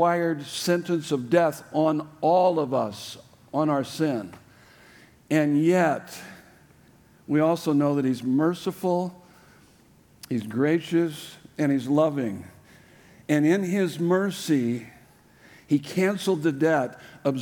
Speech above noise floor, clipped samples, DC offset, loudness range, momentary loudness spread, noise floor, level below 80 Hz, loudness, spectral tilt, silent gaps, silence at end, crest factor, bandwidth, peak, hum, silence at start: 33 dB; under 0.1%; under 0.1%; 3 LU; 12 LU; -56 dBFS; -70 dBFS; -25 LUFS; -6.5 dB/octave; none; 0 s; 18 dB; 19.5 kHz; -8 dBFS; none; 0 s